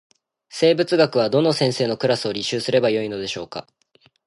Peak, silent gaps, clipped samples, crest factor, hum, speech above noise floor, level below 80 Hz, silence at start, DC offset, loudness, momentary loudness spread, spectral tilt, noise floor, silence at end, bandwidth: -4 dBFS; none; under 0.1%; 16 dB; none; 40 dB; -62 dBFS; 0.5 s; under 0.1%; -20 LUFS; 12 LU; -5 dB/octave; -59 dBFS; 0.65 s; 11.5 kHz